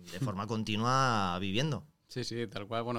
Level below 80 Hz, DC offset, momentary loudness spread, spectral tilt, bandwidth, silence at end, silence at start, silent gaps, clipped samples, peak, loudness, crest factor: -64 dBFS; under 0.1%; 11 LU; -5 dB/octave; 16 kHz; 0 s; 0 s; none; under 0.1%; -14 dBFS; -33 LUFS; 18 dB